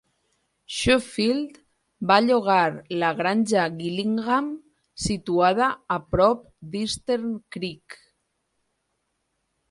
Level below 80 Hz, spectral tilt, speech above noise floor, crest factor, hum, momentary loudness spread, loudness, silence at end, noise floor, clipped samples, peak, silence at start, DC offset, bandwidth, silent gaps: -50 dBFS; -4.5 dB/octave; 52 dB; 22 dB; none; 13 LU; -23 LUFS; 1.75 s; -75 dBFS; under 0.1%; -2 dBFS; 0.7 s; under 0.1%; 11.5 kHz; none